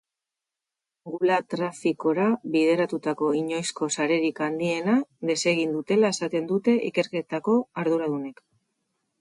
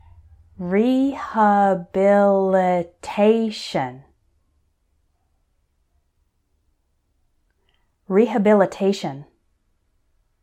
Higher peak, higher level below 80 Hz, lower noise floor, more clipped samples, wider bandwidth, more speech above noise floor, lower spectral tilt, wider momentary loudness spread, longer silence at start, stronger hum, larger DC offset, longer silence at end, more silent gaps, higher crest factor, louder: second, -10 dBFS vs -4 dBFS; second, -74 dBFS vs -58 dBFS; first, -88 dBFS vs -68 dBFS; neither; first, 11.5 kHz vs 10 kHz; first, 63 dB vs 49 dB; second, -5 dB/octave vs -7 dB/octave; second, 6 LU vs 11 LU; first, 1.05 s vs 0.6 s; neither; neither; second, 0.9 s vs 1.2 s; neither; about the same, 16 dB vs 18 dB; second, -25 LUFS vs -19 LUFS